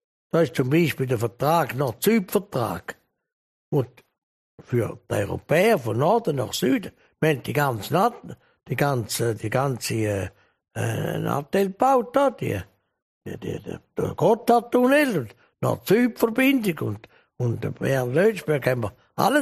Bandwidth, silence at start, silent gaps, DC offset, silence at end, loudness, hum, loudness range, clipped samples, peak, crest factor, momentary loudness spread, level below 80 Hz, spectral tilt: 15 kHz; 0.35 s; 3.33-3.72 s, 4.18-4.58 s, 13.02-13.21 s; under 0.1%; 0 s; -23 LUFS; none; 4 LU; under 0.1%; -4 dBFS; 20 dB; 13 LU; -58 dBFS; -6 dB/octave